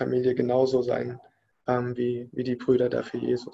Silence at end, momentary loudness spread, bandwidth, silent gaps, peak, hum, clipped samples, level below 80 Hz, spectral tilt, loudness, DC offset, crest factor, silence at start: 0 s; 8 LU; 7.8 kHz; none; -10 dBFS; none; under 0.1%; -62 dBFS; -8 dB/octave; -26 LUFS; under 0.1%; 16 dB; 0 s